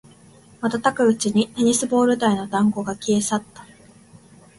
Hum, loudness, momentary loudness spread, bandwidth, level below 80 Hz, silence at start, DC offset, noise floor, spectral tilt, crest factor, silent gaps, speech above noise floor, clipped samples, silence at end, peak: none; -20 LUFS; 8 LU; 11.5 kHz; -58 dBFS; 0.6 s; under 0.1%; -49 dBFS; -4.5 dB/octave; 18 dB; none; 30 dB; under 0.1%; 0.95 s; -4 dBFS